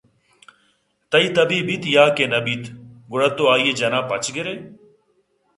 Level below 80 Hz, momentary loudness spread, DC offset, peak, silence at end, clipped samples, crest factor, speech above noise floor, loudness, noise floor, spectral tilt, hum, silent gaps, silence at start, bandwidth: -64 dBFS; 13 LU; under 0.1%; 0 dBFS; 0.85 s; under 0.1%; 20 dB; 45 dB; -19 LUFS; -64 dBFS; -4 dB/octave; none; none; 1.1 s; 11.5 kHz